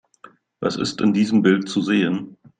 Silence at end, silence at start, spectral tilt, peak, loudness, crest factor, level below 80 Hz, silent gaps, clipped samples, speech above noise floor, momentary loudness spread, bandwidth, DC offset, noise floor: 0.25 s; 0.6 s; -6 dB/octave; -4 dBFS; -20 LUFS; 18 dB; -60 dBFS; none; under 0.1%; 31 dB; 9 LU; 9.4 kHz; under 0.1%; -50 dBFS